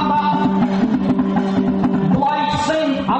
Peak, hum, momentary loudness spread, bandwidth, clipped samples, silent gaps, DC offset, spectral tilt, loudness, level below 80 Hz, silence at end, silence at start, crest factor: -6 dBFS; none; 1 LU; 8.4 kHz; under 0.1%; none; under 0.1%; -7 dB/octave; -17 LUFS; -44 dBFS; 0 s; 0 s; 10 dB